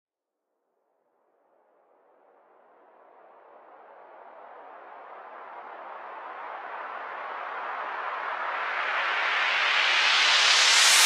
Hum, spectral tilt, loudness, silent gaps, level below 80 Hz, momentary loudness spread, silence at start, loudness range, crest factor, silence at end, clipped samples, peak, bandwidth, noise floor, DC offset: none; 4 dB/octave; -23 LUFS; none; under -90 dBFS; 26 LU; 3.7 s; 25 LU; 22 dB; 0 s; under 0.1%; -6 dBFS; 15.5 kHz; -84 dBFS; under 0.1%